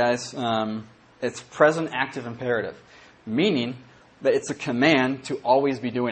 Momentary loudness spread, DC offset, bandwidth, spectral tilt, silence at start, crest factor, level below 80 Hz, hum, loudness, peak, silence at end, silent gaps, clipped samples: 12 LU; under 0.1%; 8.8 kHz; -5 dB/octave; 0 s; 22 dB; -66 dBFS; none; -24 LUFS; -2 dBFS; 0 s; none; under 0.1%